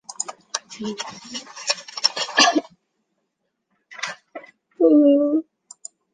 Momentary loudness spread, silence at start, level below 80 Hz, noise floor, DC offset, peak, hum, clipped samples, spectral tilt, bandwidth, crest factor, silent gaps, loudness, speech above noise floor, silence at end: 24 LU; 0.1 s; -74 dBFS; -76 dBFS; under 0.1%; -2 dBFS; none; under 0.1%; -1.5 dB/octave; 9.8 kHz; 22 dB; none; -20 LUFS; 57 dB; 0.7 s